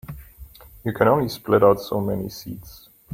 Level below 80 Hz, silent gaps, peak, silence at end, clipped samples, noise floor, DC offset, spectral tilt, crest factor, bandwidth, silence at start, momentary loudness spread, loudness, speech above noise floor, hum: -48 dBFS; none; -2 dBFS; 0 s; under 0.1%; -44 dBFS; under 0.1%; -7 dB/octave; 20 dB; 16.5 kHz; 0.1 s; 21 LU; -21 LUFS; 23 dB; none